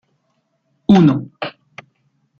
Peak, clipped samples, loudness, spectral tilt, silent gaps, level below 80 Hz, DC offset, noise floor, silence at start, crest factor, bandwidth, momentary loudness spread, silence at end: -2 dBFS; under 0.1%; -14 LUFS; -8.5 dB/octave; none; -52 dBFS; under 0.1%; -67 dBFS; 0.9 s; 16 dB; 6.8 kHz; 17 LU; 0.9 s